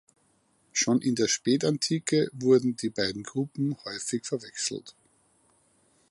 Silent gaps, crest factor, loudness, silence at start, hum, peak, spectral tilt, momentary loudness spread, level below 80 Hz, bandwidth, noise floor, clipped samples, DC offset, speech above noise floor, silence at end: none; 18 dB; -27 LUFS; 0.75 s; none; -10 dBFS; -4 dB/octave; 9 LU; -68 dBFS; 11.5 kHz; -68 dBFS; under 0.1%; under 0.1%; 41 dB; 1.2 s